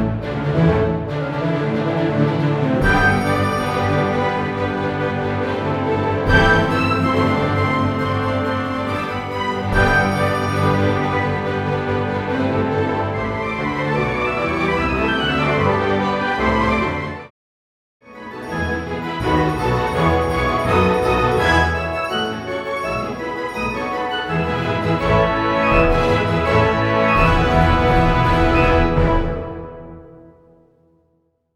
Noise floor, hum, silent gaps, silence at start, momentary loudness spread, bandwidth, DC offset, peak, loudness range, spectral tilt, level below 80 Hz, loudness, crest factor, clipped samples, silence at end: -64 dBFS; none; 17.30-18.00 s; 0 s; 8 LU; 13.5 kHz; under 0.1%; 0 dBFS; 5 LU; -7 dB/octave; -30 dBFS; -18 LUFS; 18 dB; under 0.1%; 1.25 s